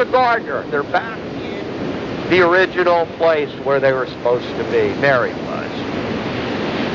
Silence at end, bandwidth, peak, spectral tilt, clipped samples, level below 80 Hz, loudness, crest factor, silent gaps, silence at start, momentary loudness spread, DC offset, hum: 0 s; 7.6 kHz; -2 dBFS; -6.5 dB/octave; under 0.1%; -46 dBFS; -18 LUFS; 16 dB; none; 0 s; 10 LU; under 0.1%; none